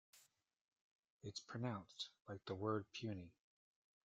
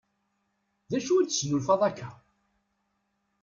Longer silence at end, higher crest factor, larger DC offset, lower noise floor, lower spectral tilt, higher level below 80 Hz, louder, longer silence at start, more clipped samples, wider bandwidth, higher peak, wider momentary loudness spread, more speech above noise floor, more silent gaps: second, 0.75 s vs 1.3 s; about the same, 22 dB vs 20 dB; neither; about the same, -78 dBFS vs -77 dBFS; about the same, -5.5 dB/octave vs -4.5 dB/octave; second, -84 dBFS vs -68 dBFS; second, -49 LUFS vs -27 LUFS; second, 0.15 s vs 0.9 s; neither; first, 9 kHz vs 7.6 kHz; second, -28 dBFS vs -12 dBFS; second, 11 LU vs 14 LU; second, 30 dB vs 50 dB; first, 0.61-0.72 s, 0.81-1.03 s, 1.10-1.19 s vs none